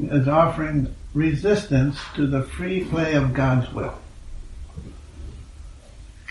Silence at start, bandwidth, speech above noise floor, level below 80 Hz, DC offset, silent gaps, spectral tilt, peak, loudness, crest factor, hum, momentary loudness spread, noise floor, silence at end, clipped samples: 0 s; 11.5 kHz; 22 dB; -38 dBFS; under 0.1%; none; -7.5 dB/octave; -4 dBFS; -22 LUFS; 18 dB; none; 22 LU; -43 dBFS; 0 s; under 0.1%